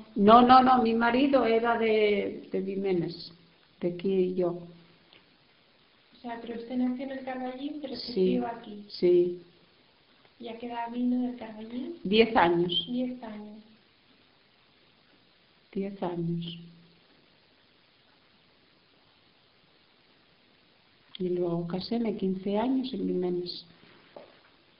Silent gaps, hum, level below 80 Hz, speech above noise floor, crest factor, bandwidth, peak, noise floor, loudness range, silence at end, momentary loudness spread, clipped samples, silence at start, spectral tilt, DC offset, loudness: none; none; -62 dBFS; 36 dB; 26 dB; 5.4 kHz; -4 dBFS; -63 dBFS; 11 LU; 0.55 s; 18 LU; under 0.1%; 0 s; -4 dB/octave; under 0.1%; -27 LUFS